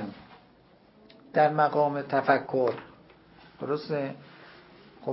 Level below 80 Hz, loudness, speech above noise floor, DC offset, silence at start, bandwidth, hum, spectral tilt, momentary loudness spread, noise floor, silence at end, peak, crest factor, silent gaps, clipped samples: -70 dBFS; -27 LUFS; 32 dB; under 0.1%; 0 s; 5.8 kHz; none; -10 dB/octave; 17 LU; -58 dBFS; 0 s; -8 dBFS; 22 dB; none; under 0.1%